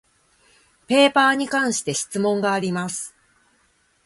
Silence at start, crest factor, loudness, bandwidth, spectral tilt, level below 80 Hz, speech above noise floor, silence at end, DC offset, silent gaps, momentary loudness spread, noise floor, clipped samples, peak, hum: 0.9 s; 20 dB; -20 LUFS; 11.5 kHz; -3.5 dB/octave; -66 dBFS; 43 dB; 0.95 s; under 0.1%; none; 12 LU; -63 dBFS; under 0.1%; -2 dBFS; none